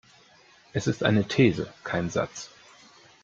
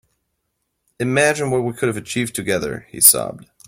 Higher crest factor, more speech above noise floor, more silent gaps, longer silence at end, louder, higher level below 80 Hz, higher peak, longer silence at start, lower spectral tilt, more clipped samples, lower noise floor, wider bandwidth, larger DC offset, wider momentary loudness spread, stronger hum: about the same, 20 dB vs 20 dB; second, 31 dB vs 55 dB; neither; first, 0.75 s vs 0.25 s; second, -26 LUFS vs -17 LUFS; about the same, -58 dBFS vs -54 dBFS; second, -8 dBFS vs 0 dBFS; second, 0.75 s vs 1 s; first, -6 dB/octave vs -3 dB/octave; neither; second, -57 dBFS vs -74 dBFS; second, 7.8 kHz vs 16.5 kHz; neither; about the same, 12 LU vs 14 LU; neither